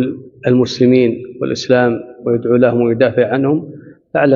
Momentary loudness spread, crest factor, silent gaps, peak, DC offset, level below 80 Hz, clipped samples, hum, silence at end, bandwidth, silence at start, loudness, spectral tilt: 10 LU; 14 dB; none; 0 dBFS; under 0.1%; -54 dBFS; under 0.1%; none; 0 s; 7.4 kHz; 0 s; -14 LUFS; -6 dB/octave